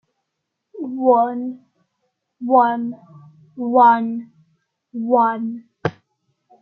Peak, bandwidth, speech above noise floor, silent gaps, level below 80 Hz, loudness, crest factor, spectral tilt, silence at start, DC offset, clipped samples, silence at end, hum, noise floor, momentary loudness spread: -2 dBFS; 6 kHz; 61 dB; none; -68 dBFS; -18 LUFS; 18 dB; -9 dB/octave; 0.75 s; under 0.1%; under 0.1%; 0.7 s; none; -78 dBFS; 17 LU